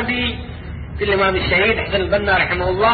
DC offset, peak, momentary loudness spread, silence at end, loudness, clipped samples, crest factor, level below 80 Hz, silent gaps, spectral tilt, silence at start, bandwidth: under 0.1%; -2 dBFS; 15 LU; 0 s; -17 LUFS; under 0.1%; 16 dB; -32 dBFS; none; -10.5 dB/octave; 0 s; 4.8 kHz